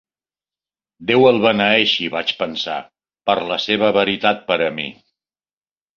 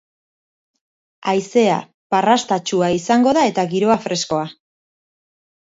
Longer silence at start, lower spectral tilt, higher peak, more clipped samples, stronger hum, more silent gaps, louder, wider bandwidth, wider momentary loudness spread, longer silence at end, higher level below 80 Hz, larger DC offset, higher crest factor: second, 1 s vs 1.25 s; about the same, -5 dB/octave vs -4.5 dB/octave; about the same, 0 dBFS vs -2 dBFS; neither; neither; second, none vs 1.94-2.10 s; about the same, -17 LUFS vs -18 LUFS; second, 7 kHz vs 8 kHz; first, 12 LU vs 8 LU; about the same, 1.05 s vs 1.15 s; about the same, -60 dBFS vs -60 dBFS; neither; about the same, 18 dB vs 18 dB